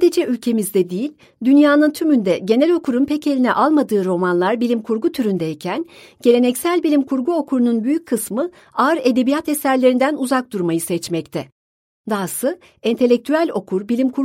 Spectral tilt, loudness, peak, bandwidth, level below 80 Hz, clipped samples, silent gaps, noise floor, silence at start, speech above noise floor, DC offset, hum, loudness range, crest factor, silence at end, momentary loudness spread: -5.5 dB/octave; -18 LUFS; -2 dBFS; 16.5 kHz; -64 dBFS; under 0.1%; 11.52-12.04 s; under -90 dBFS; 0 s; over 73 dB; under 0.1%; none; 5 LU; 16 dB; 0 s; 9 LU